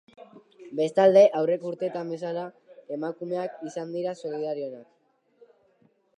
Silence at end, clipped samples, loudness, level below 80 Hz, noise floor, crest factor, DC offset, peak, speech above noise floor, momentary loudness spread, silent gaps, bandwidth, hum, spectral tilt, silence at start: 1.35 s; under 0.1%; -26 LUFS; -84 dBFS; -65 dBFS; 20 dB; under 0.1%; -6 dBFS; 40 dB; 18 LU; none; 9.4 kHz; none; -6.5 dB/octave; 0.2 s